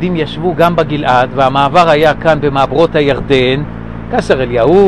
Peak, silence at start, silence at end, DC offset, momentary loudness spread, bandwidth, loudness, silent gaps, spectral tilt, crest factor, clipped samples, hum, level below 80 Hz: 0 dBFS; 0 s; 0 s; 2%; 8 LU; 12 kHz; -11 LUFS; none; -6.5 dB/octave; 10 dB; under 0.1%; none; -32 dBFS